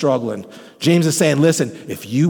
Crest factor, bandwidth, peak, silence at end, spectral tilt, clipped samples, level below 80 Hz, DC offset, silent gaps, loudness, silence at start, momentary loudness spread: 14 dB; 19 kHz; -2 dBFS; 0 s; -5.5 dB/octave; under 0.1%; -64 dBFS; under 0.1%; none; -17 LUFS; 0 s; 13 LU